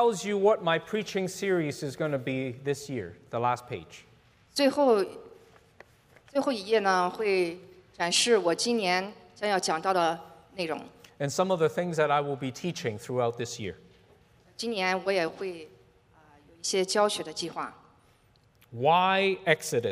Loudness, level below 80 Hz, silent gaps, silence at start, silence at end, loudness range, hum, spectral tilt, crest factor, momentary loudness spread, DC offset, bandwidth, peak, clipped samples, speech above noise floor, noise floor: -28 LUFS; -70 dBFS; none; 0 s; 0 s; 6 LU; none; -4 dB/octave; 22 dB; 13 LU; under 0.1%; 15.5 kHz; -8 dBFS; under 0.1%; 35 dB; -63 dBFS